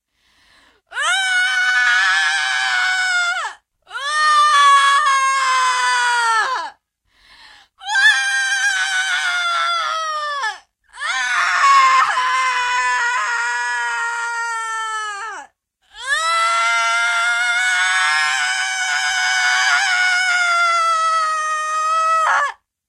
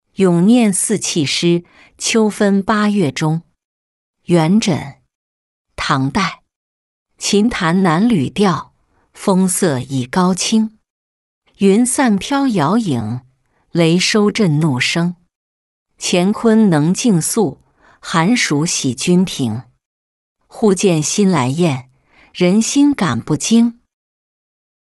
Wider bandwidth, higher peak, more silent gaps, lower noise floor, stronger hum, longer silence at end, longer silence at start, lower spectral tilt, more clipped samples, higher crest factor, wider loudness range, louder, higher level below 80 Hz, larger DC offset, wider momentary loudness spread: first, 14.5 kHz vs 12 kHz; about the same, -2 dBFS vs -2 dBFS; second, none vs 3.65-4.14 s, 5.15-5.65 s, 6.56-7.06 s, 10.90-11.42 s, 15.36-15.86 s, 19.86-20.36 s; first, -60 dBFS vs -50 dBFS; neither; second, 0.35 s vs 1.1 s; first, 0.9 s vs 0.2 s; second, 4 dB/octave vs -5 dB/octave; neither; about the same, 14 dB vs 14 dB; about the same, 4 LU vs 3 LU; about the same, -16 LUFS vs -15 LUFS; second, -64 dBFS vs -50 dBFS; neither; about the same, 10 LU vs 9 LU